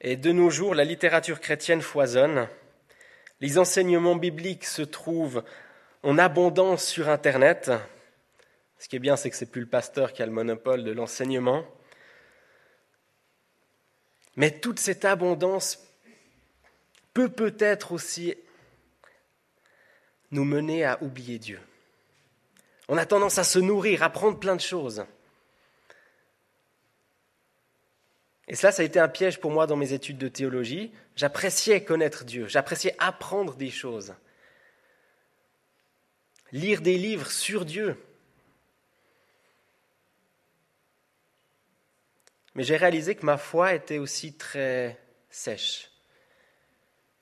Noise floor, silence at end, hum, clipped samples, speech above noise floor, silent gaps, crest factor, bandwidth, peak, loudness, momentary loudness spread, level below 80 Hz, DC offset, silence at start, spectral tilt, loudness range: -72 dBFS; 1.4 s; none; under 0.1%; 46 dB; none; 24 dB; 14 kHz; -4 dBFS; -25 LUFS; 15 LU; -74 dBFS; under 0.1%; 0.05 s; -4 dB/octave; 9 LU